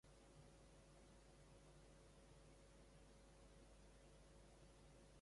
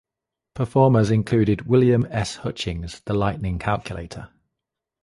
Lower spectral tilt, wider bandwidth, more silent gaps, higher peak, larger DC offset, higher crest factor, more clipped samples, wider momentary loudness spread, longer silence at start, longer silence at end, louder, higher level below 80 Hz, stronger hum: second, -4.5 dB/octave vs -7 dB/octave; about the same, 11.5 kHz vs 11.5 kHz; neither; second, -56 dBFS vs -4 dBFS; neither; second, 12 dB vs 18 dB; neither; second, 1 LU vs 16 LU; second, 0.05 s vs 0.55 s; second, 0 s vs 0.75 s; second, -68 LUFS vs -21 LUFS; second, -72 dBFS vs -42 dBFS; neither